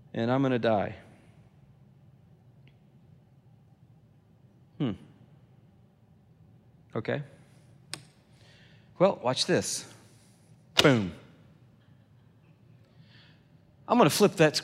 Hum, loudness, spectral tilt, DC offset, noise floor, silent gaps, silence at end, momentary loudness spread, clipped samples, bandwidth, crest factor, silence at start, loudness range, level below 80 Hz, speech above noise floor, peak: none; -27 LUFS; -4.5 dB/octave; under 0.1%; -60 dBFS; none; 0 s; 21 LU; under 0.1%; 16 kHz; 28 dB; 0.15 s; 15 LU; -70 dBFS; 34 dB; -4 dBFS